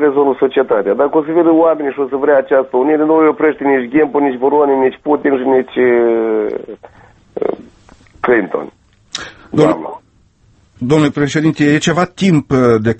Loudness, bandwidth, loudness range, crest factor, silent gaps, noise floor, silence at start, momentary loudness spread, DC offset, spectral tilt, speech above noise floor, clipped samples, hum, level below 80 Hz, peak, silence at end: -13 LUFS; 8.6 kHz; 6 LU; 14 dB; none; -51 dBFS; 0 s; 12 LU; under 0.1%; -6.5 dB/octave; 39 dB; under 0.1%; none; -50 dBFS; 0 dBFS; 0.05 s